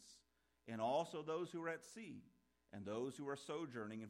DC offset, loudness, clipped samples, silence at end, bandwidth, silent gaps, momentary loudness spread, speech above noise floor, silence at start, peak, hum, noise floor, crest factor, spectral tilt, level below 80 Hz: under 0.1%; -46 LUFS; under 0.1%; 0 s; 16 kHz; none; 18 LU; 33 dB; 0 s; -30 dBFS; none; -79 dBFS; 18 dB; -5 dB/octave; -88 dBFS